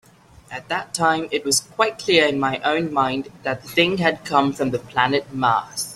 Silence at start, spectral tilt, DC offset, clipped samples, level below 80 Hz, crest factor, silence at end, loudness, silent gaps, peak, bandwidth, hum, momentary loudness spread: 0.5 s; -3.5 dB/octave; under 0.1%; under 0.1%; -56 dBFS; 20 dB; 0 s; -20 LUFS; none; -2 dBFS; 15 kHz; none; 10 LU